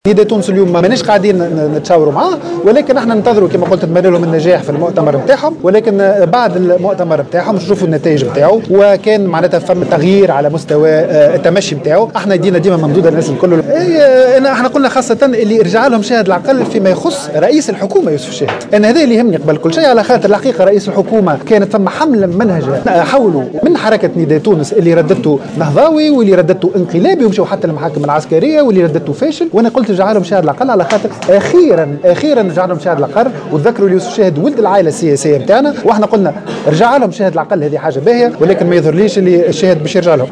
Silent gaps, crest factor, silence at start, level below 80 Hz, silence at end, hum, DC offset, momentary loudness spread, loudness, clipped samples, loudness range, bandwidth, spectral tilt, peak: none; 10 dB; 0.05 s; -50 dBFS; 0 s; none; 0.1%; 5 LU; -10 LUFS; 0.6%; 2 LU; 10.5 kHz; -6.5 dB/octave; 0 dBFS